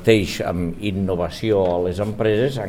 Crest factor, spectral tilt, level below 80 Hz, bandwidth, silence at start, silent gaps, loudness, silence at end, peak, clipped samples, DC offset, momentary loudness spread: 18 dB; -6.5 dB/octave; -40 dBFS; 16 kHz; 0 s; none; -21 LUFS; 0 s; -2 dBFS; under 0.1%; 0.4%; 6 LU